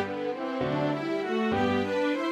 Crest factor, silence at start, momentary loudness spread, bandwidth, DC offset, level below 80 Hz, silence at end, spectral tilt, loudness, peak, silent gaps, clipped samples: 12 dB; 0 s; 5 LU; 12 kHz; under 0.1%; -60 dBFS; 0 s; -6.5 dB/octave; -28 LUFS; -16 dBFS; none; under 0.1%